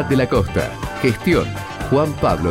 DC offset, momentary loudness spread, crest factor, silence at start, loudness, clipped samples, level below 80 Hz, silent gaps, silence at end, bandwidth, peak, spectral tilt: 0.3%; 8 LU; 14 dB; 0 s; -19 LUFS; under 0.1%; -34 dBFS; none; 0 s; 16.5 kHz; -4 dBFS; -6.5 dB/octave